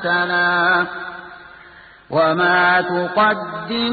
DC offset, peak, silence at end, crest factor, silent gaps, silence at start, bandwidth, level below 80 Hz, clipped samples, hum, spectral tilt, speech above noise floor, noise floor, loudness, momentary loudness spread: under 0.1%; -4 dBFS; 0 s; 14 dB; none; 0 s; 4.8 kHz; -56 dBFS; under 0.1%; none; -10 dB/octave; 26 dB; -44 dBFS; -17 LUFS; 16 LU